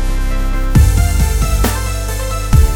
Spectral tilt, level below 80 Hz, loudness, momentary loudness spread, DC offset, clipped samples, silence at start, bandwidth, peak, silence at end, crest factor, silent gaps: -5 dB/octave; -14 dBFS; -15 LUFS; 8 LU; under 0.1%; under 0.1%; 0 s; 17.5 kHz; 0 dBFS; 0 s; 12 dB; none